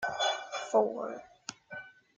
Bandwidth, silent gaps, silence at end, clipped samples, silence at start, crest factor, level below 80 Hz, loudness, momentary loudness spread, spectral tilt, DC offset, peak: 9.6 kHz; none; 0.25 s; under 0.1%; 0 s; 20 dB; -78 dBFS; -32 LUFS; 17 LU; -2 dB/octave; under 0.1%; -14 dBFS